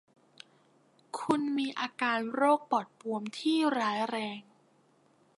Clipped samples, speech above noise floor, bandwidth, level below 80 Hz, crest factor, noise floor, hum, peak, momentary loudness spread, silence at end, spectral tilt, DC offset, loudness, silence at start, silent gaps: under 0.1%; 36 dB; 11.5 kHz; -84 dBFS; 20 dB; -66 dBFS; none; -12 dBFS; 11 LU; 0.95 s; -4.5 dB/octave; under 0.1%; -31 LUFS; 1.15 s; none